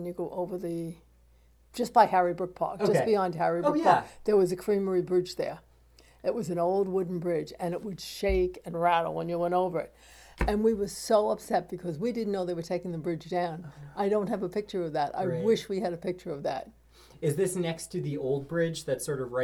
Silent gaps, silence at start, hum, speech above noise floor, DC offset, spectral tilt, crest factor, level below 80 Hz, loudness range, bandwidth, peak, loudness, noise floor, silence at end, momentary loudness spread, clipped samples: none; 0 s; none; 32 dB; under 0.1%; -6 dB/octave; 22 dB; -50 dBFS; 5 LU; 18 kHz; -8 dBFS; -29 LUFS; -60 dBFS; 0 s; 10 LU; under 0.1%